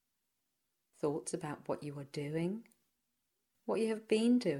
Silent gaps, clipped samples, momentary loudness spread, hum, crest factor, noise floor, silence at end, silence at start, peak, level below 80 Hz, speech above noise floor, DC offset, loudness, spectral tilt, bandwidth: none; under 0.1%; 12 LU; none; 20 dB; -85 dBFS; 0 s; 1.05 s; -18 dBFS; -80 dBFS; 50 dB; under 0.1%; -37 LUFS; -6 dB/octave; 12.5 kHz